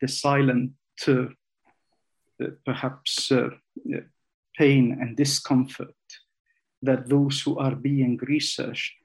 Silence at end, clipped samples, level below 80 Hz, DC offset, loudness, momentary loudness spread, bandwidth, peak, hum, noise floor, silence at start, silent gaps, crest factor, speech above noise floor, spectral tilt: 0.1 s; under 0.1%; -72 dBFS; under 0.1%; -25 LUFS; 13 LU; 12.5 kHz; -8 dBFS; none; -77 dBFS; 0 s; 4.34-4.43 s, 6.40-6.45 s, 6.77-6.82 s; 18 dB; 53 dB; -5 dB/octave